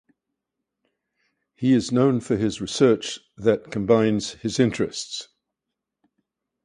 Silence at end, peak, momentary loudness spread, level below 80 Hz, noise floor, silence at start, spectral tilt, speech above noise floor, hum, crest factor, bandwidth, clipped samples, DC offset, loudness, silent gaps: 1.4 s; -4 dBFS; 9 LU; -56 dBFS; -84 dBFS; 1.6 s; -5.5 dB/octave; 62 dB; none; 20 dB; 10.5 kHz; under 0.1%; under 0.1%; -22 LUFS; none